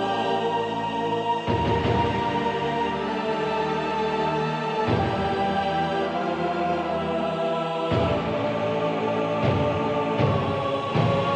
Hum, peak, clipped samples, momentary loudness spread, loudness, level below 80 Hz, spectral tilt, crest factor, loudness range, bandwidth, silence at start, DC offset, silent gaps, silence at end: none; -10 dBFS; under 0.1%; 3 LU; -25 LUFS; -50 dBFS; -7 dB/octave; 14 dB; 1 LU; 9.6 kHz; 0 s; under 0.1%; none; 0 s